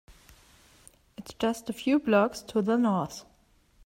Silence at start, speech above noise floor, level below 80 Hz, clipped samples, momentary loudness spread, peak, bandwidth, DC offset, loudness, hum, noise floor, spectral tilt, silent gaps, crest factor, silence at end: 1.2 s; 37 dB; -62 dBFS; under 0.1%; 22 LU; -12 dBFS; 16 kHz; under 0.1%; -27 LUFS; none; -63 dBFS; -6 dB/octave; none; 18 dB; 0.65 s